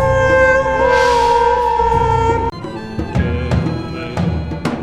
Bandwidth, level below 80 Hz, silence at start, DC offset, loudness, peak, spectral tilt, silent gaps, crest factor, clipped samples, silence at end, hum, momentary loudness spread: 12.5 kHz; -28 dBFS; 0 s; under 0.1%; -15 LUFS; -2 dBFS; -6 dB/octave; none; 12 dB; under 0.1%; 0 s; none; 11 LU